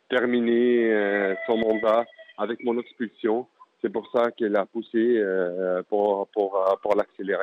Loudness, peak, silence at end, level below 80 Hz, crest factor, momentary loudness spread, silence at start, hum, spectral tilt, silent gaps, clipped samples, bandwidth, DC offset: -24 LUFS; -10 dBFS; 0 s; -70 dBFS; 14 dB; 9 LU; 0.1 s; none; -7.5 dB/octave; none; under 0.1%; 5.4 kHz; under 0.1%